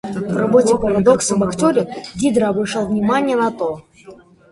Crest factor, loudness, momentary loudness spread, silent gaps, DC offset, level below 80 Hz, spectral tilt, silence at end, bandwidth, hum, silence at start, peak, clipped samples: 16 dB; -17 LUFS; 9 LU; none; under 0.1%; -46 dBFS; -5.5 dB/octave; 0.4 s; 11.5 kHz; none; 0.05 s; 0 dBFS; under 0.1%